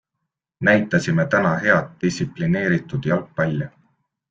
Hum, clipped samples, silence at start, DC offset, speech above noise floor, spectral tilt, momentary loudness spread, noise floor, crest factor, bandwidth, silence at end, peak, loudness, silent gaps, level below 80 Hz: none; under 0.1%; 0.6 s; under 0.1%; 60 dB; -6.5 dB/octave; 7 LU; -80 dBFS; 18 dB; 7.8 kHz; 0.6 s; -2 dBFS; -20 LUFS; none; -54 dBFS